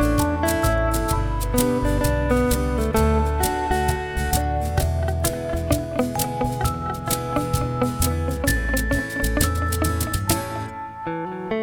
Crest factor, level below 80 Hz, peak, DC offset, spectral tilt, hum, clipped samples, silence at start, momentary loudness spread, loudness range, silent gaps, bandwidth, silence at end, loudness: 20 dB; -28 dBFS; -2 dBFS; under 0.1%; -5 dB/octave; none; under 0.1%; 0 s; 5 LU; 3 LU; none; over 20 kHz; 0 s; -23 LUFS